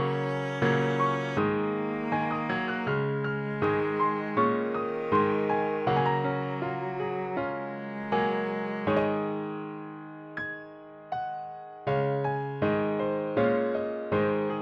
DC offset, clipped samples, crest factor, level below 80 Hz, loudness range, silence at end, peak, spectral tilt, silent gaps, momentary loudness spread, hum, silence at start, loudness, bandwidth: under 0.1%; under 0.1%; 16 dB; -64 dBFS; 5 LU; 0 s; -12 dBFS; -8 dB/octave; none; 11 LU; none; 0 s; -29 LUFS; 7.4 kHz